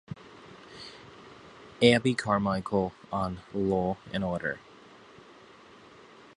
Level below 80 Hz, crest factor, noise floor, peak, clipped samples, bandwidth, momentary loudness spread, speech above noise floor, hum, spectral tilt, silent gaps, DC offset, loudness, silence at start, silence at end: -56 dBFS; 26 dB; -53 dBFS; -4 dBFS; under 0.1%; 11 kHz; 26 LU; 26 dB; none; -6 dB/octave; none; under 0.1%; -28 LUFS; 0.1 s; 1.8 s